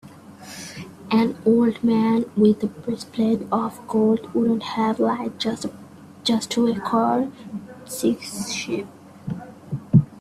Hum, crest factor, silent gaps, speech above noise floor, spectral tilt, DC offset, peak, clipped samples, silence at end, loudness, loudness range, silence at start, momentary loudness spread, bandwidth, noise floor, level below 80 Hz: none; 18 dB; none; 20 dB; -6 dB/octave; under 0.1%; -4 dBFS; under 0.1%; 0 s; -22 LUFS; 4 LU; 0.05 s; 17 LU; 14.5 kHz; -42 dBFS; -58 dBFS